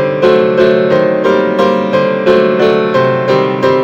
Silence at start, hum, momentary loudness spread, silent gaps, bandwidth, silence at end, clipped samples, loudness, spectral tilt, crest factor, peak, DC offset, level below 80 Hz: 0 s; none; 2 LU; none; 7.8 kHz; 0 s; under 0.1%; -10 LUFS; -7 dB/octave; 10 dB; 0 dBFS; under 0.1%; -50 dBFS